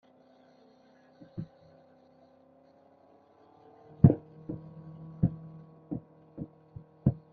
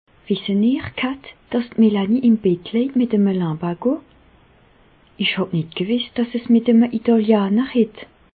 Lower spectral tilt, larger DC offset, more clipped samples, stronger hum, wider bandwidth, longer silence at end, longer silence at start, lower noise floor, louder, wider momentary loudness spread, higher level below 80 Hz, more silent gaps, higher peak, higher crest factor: first, -13 dB/octave vs -11.5 dB/octave; neither; neither; neither; second, 2.4 kHz vs 4.7 kHz; second, 0.15 s vs 0.35 s; first, 1.35 s vs 0.3 s; first, -61 dBFS vs -53 dBFS; second, -31 LUFS vs -19 LUFS; first, 27 LU vs 9 LU; about the same, -52 dBFS vs -56 dBFS; neither; about the same, -4 dBFS vs -4 dBFS; first, 30 dB vs 16 dB